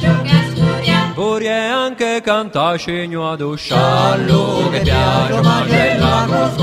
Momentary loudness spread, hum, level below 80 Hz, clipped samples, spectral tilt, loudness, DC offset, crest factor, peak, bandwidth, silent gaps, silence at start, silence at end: 7 LU; none; -34 dBFS; under 0.1%; -6 dB/octave; -15 LUFS; under 0.1%; 14 dB; 0 dBFS; 13.5 kHz; none; 0 s; 0 s